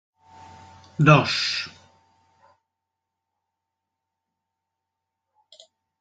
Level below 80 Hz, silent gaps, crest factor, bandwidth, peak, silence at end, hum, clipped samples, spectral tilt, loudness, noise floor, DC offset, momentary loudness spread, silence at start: -60 dBFS; none; 26 dB; 7.8 kHz; -2 dBFS; 4.3 s; none; under 0.1%; -5.5 dB/octave; -19 LUFS; -83 dBFS; under 0.1%; 20 LU; 1 s